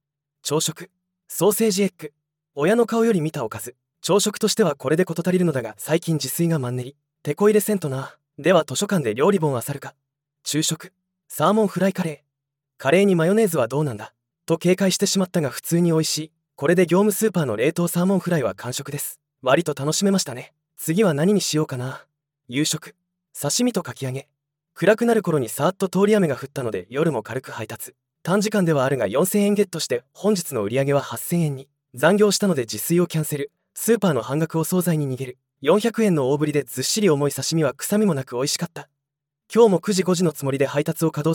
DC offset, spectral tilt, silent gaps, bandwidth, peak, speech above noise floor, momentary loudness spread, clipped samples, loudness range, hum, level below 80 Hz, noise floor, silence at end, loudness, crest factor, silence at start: under 0.1%; -5 dB/octave; none; 18 kHz; -2 dBFS; 63 dB; 13 LU; under 0.1%; 2 LU; none; -70 dBFS; -84 dBFS; 0 s; -21 LUFS; 18 dB; 0.45 s